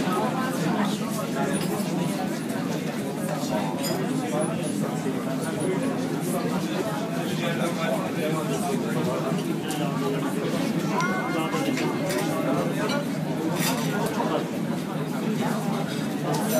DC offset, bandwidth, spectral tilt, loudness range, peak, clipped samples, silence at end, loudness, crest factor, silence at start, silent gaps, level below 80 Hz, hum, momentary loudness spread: under 0.1%; 15.5 kHz; -5.5 dB/octave; 2 LU; -12 dBFS; under 0.1%; 0 s; -26 LUFS; 14 dB; 0 s; none; -66 dBFS; none; 3 LU